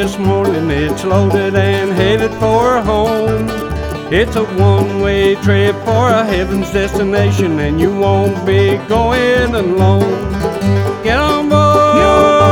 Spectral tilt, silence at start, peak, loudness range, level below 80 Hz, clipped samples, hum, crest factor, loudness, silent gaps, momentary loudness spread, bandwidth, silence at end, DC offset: -6.5 dB/octave; 0 s; 0 dBFS; 1 LU; -28 dBFS; under 0.1%; none; 12 dB; -13 LUFS; none; 7 LU; 16.5 kHz; 0 s; under 0.1%